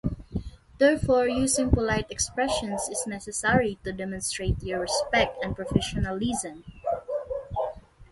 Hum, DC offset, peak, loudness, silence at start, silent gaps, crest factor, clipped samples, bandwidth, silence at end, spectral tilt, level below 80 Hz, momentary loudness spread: none; under 0.1%; -6 dBFS; -27 LUFS; 0.05 s; none; 20 dB; under 0.1%; 12 kHz; 0.05 s; -4 dB/octave; -40 dBFS; 11 LU